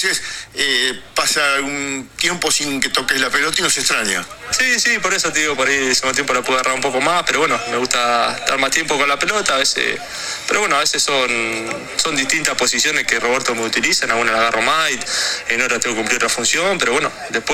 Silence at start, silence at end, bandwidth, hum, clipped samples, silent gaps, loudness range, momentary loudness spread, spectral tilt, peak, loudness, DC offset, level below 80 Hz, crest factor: 0 s; 0 s; 18 kHz; none; under 0.1%; none; 1 LU; 5 LU; -1 dB/octave; 0 dBFS; -16 LUFS; under 0.1%; -48 dBFS; 18 dB